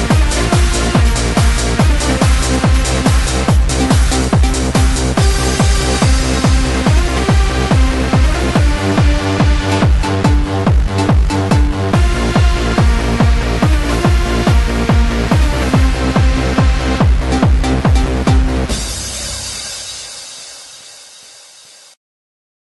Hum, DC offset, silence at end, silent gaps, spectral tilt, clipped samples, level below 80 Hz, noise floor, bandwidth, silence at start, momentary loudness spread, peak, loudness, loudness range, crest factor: none; under 0.1%; 1.6 s; none; -5 dB/octave; under 0.1%; -16 dBFS; -41 dBFS; 12 kHz; 0 s; 6 LU; 0 dBFS; -13 LUFS; 4 LU; 12 dB